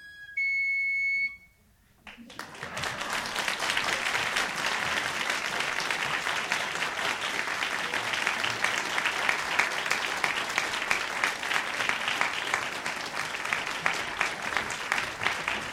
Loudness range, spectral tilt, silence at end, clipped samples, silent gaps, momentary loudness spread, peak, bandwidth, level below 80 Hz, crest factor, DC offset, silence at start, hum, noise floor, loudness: 3 LU; -1 dB/octave; 0 s; under 0.1%; none; 6 LU; -8 dBFS; 17 kHz; -62 dBFS; 22 dB; under 0.1%; 0 s; none; -62 dBFS; -28 LUFS